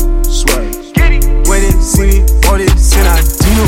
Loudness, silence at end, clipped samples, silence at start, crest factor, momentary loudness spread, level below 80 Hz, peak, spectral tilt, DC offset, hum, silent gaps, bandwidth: -11 LUFS; 0 s; 0.1%; 0 s; 8 dB; 4 LU; -8 dBFS; 0 dBFS; -4.5 dB/octave; under 0.1%; none; none; 17 kHz